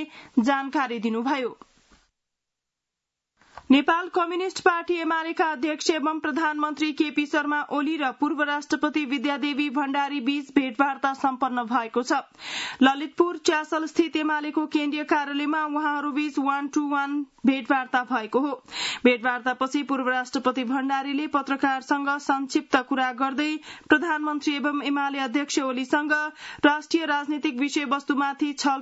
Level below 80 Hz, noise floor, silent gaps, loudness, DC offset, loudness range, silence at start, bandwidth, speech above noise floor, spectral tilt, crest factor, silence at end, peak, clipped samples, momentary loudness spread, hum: -70 dBFS; -85 dBFS; none; -25 LUFS; under 0.1%; 1 LU; 0 s; 8 kHz; 61 dB; -3 dB/octave; 20 dB; 0 s; -4 dBFS; under 0.1%; 5 LU; none